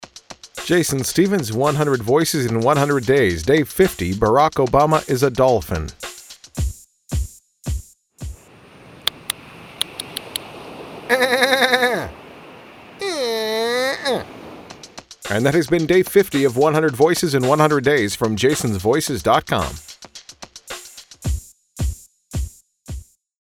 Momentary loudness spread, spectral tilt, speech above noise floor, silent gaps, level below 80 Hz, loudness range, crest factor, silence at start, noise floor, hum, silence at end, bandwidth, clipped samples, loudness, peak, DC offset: 20 LU; -4.5 dB/octave; 29 dB; none; -36 dBFS; 12 LU; 20 dB; 0 s; -46 dBFS; none; 0.4 s; 19.5 kHz; under 0.1%; -19 LUFS; 0 dBFS; under 0.1%